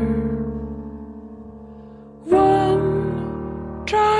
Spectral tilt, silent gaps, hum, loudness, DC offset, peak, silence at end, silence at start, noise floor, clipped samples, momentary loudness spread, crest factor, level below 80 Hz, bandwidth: -7.5 dB/octave; none; none; -21 LUFS; under 0.1%; -4 dBFS; 0 s; 0 s; -41 dBFS; under 0.1%; 24 LU; 16 dB; -38 dBFS; 10.5 kHz